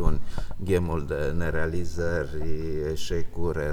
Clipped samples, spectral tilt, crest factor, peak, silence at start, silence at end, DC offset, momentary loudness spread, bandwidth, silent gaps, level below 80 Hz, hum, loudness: under 0.1%; -6.5 dB/octave; 18 dB; -6 dBFS; 0 s; 0 s; under 0.1%; 6 LU; 11.5 kHz; none; -32 dBFS; none; -29 LUFS